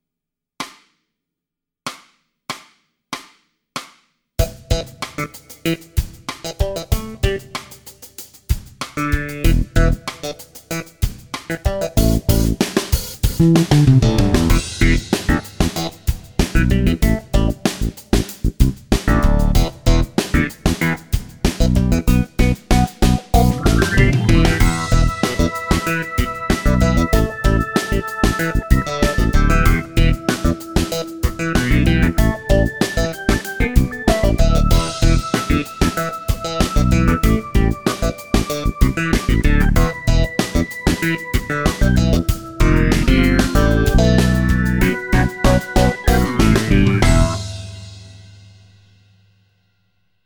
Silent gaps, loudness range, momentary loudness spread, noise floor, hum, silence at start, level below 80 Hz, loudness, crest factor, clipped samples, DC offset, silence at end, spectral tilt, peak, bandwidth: none; 9 LU; 13 LU; -84 dBFS; none; 0.6 s; -20 dBFS; -18 LUFS; 16 dB; under 0.1%; 0.2%; 2 s; -5.5 dB/octave; 0 dBFS; over 20 kHz